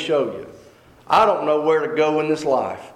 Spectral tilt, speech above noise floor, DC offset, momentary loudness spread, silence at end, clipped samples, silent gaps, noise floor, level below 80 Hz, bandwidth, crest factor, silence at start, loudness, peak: -5 dB/octave; 29 dB; under 0.1%; 6 LU; 0.05 s; under 0.1%; none; -48 dBFS; -60 dBFS; 12 kHz; 14 dB; 0 s; -19 LUFS; -6 dBFS